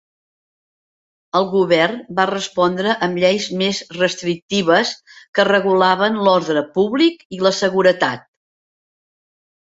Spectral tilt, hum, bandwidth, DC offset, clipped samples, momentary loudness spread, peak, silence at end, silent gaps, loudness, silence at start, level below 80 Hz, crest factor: -4.5 dB/octave; none; 8 kHz; under 0.1%; under 0.1%; 6 LU; 0 dBFS; 1.45 s; 4.42-4.49 s, 5.28-5.33 s, 7.25-7.30 s; -17 LUFS; 1.35 s; -62 dBFS; 18 dB